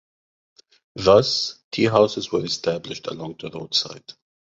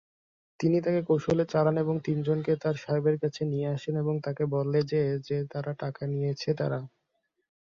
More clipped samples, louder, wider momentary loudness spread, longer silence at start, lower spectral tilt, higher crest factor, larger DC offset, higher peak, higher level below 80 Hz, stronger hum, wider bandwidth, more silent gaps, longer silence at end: neither; first, -21 LUFS vs -29 LUFS; first, 16 LU vs 7 LU; first, 0.95 s vs 0.6 s; second, -4.5 dB/octave vs -8 dB/octave; about the same, 20 dB vs 16 dB; neither; first, -2 dBFS vs -12 dBFS; first, -54 dBFS vs -64 dBFS; neither; about the same, 7.8 kHz vs 7.2 kHz; first, 1.64-1.71 s vs none; second, 0.5 s vs 0.8 s